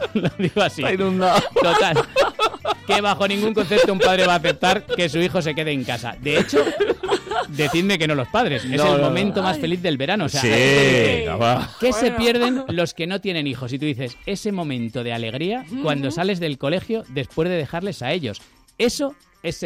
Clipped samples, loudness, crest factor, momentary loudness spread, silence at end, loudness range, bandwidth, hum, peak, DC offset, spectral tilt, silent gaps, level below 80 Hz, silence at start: under 0.1%; -20 LUFS; 12 dB; 10 LU; 0 s; 6 LU; 16 kHz; none; -8 dBFS; under 0.1%; -5 dB/octave; none; -48 dBFS; 0 s